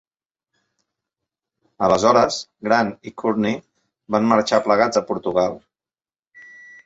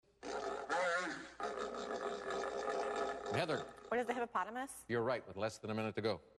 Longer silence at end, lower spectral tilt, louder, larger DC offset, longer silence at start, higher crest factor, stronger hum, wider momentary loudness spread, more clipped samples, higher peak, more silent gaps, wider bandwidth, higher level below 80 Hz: first, 0.45 s vs 0.1 s; about the same, -5 dB/octave vs -4.5 dB/octave; first, -19 LUFS vs -40 LUFS; neither; first, 1.8 s vs 0.2 s; about the same, 20 dB vs 16 dB; neither; first, 10 LU vs 6 LU; neither; first, -2 dBFS vs -24 dBFS; first, 6.19-6.31 s vs none; second, 8 kHz vs 12.5 kHz; first, -56 dBFS vs -72 dBFS